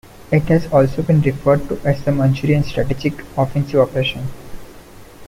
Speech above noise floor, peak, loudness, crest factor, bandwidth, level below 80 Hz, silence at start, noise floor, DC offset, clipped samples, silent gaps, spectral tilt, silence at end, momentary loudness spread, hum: 23 dB; -2 dBFS; -17 LUFS; 16 dB; 15.5 kHz; -36 dBFS; 0.2 s; -39 dBFS; under 0.1%; under 0.1%; none; -8 dB/octave; 0 s; 6 LU; none